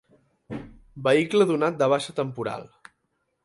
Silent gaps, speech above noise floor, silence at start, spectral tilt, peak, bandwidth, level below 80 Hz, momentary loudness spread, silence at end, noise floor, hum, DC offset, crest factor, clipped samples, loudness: none; 52 dB; 0.5 s; -5.5 dB/octave; -8 dBFS; 11.5 kHz; -60 dBFS; 18 LU; 0.8 s; -75 dBFS; none; under 0.1%; 18 dB; under 0.1%; -24 LUFS